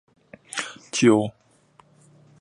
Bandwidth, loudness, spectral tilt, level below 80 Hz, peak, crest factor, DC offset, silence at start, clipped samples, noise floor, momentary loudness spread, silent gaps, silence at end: 11.5 kHz; -23 LUFS; -4.5 dB/octave; -66 dBFS; -4 dBFS; 22 dB; under 0.1%; 0.55 s; under 0.1%; -58 dBFS; 14 LU; none; 1.1 s